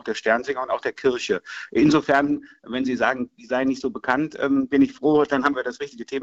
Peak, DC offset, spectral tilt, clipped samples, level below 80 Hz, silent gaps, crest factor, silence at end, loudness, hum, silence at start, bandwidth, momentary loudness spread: -4 dBFS; under 0.1%; -5.5 dB/octave; under 0.1%; -56 dBFS; none; 18 dB; 0 s; -22 LUFS; none; 0.05 s; 8 kHz; 9 LU